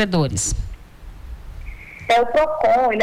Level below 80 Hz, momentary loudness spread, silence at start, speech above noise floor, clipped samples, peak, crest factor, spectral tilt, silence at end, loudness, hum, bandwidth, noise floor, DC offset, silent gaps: -34 dBFS; 21 LU; 0 s; 21 dB; under 0.1%; -10 dBFS; 10 dB; -4.5 dB/octave; 0 s; -19 LUFS; none; 18.5 kHz; -38 dBFS; under 0.1%; none